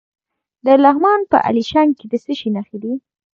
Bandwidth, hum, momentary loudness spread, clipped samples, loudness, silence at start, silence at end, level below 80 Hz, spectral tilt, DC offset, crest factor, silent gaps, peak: 7.2 kHz; none; 14 LU; under 0.1%; -16 LUFS; 0.65 s; 0.4 s; -56 dBFS; -6.5 dB/octave; under 0.1%; 16 dB; none; 0 dBFS